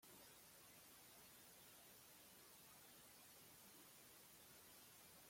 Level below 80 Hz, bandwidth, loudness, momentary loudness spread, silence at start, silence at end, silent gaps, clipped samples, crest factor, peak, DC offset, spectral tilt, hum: -88 dBFS; 16.5 kHz; -63 LUFS; 0 LU; 0 s; 0 s; none; under 0.1%; 14 dB; -52 dBFS; under 0.1%; -1.5 dB/octave; none